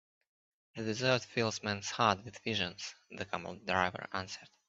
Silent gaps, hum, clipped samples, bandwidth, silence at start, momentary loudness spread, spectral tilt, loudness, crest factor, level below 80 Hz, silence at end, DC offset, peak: none; none; under 0.1%; 8.2 kHz; 0.75 s; 14 LU; -4 dB/octave; -35 LUFS; 24 dB; -74 dBFS; 0.2 s; under 0.1%; -12 dBFS